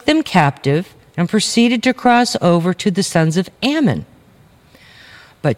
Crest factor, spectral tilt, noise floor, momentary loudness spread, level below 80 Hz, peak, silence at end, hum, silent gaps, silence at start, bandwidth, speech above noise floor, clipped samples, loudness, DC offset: 16 dB; -5 dB/octave; -48 dBFS; 7 LU; -52 dBFS; 0 dBFS; 0 s; none; none; 0.05 s; 15.5 kHz; 33 dB; under 0.1%; -15 LUFS; under 0.1%